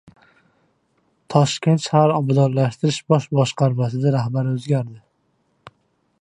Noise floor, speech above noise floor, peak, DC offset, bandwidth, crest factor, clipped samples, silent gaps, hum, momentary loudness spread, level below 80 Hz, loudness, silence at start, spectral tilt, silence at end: -66 dBFS; 48 dB; -2 dBFS; under 0.1%; 10 kHz; 20 dB; under 0.1%; none; none; 6 LU; -62 dBFS; -19 LUFS; 1.3 s; -6.5 dB/octave; 1.2 s